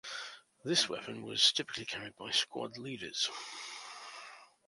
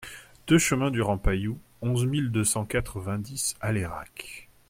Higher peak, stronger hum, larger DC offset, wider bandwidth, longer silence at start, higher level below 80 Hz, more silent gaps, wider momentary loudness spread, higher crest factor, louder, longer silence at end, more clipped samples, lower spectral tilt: second, -12 dBFS vs -8 dBFS; neither; neither; second, 11.5 kHz vs 16.5 kHz; about the same, 0.05 s vs 0 s; second, -76 dBFS vs -40 dBFS; neither; about the same, 19 LU vs 17 LU; first, 26 dB vs 18 dB; second, -33 LUFS vs -27 LUFS; about the same, 0.2 s vs 0.25 s; neither; second, -1.5 dB/octave vs -4.5 dB/octave